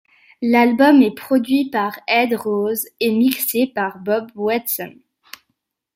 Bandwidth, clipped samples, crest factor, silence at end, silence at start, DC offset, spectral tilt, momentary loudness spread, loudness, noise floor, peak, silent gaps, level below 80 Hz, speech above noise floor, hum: 16.5 kHz; under 0.1%; 18 dB; 1.05 s; 0.4 s; under 0.1%; -4 dB/octave; 10 LU; -18 LUFS; -73 dBFS; -2 dBFS; none; -66 dBFS; 56 dB; none